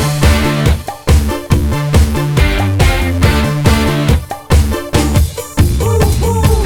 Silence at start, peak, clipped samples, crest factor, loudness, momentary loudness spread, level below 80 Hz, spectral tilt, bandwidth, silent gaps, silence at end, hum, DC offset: 0 s; 0 dBFS; under 0.1%; 12 dB; -13 LUFS; 3 LU; -16 dBFS; -5.5 dB/octave; 18 kHz; none; 0 s; none; under 0.1%